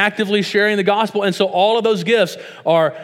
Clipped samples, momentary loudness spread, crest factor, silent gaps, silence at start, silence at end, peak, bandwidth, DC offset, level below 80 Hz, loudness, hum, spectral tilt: under 0.1%; 3 LU; 16 dB; none; 0 s; 0 s; 0 dBFS; 15.5 kHz; under 0.1%; -74 dBFS; -16 LUFS; none; -5 dB/octave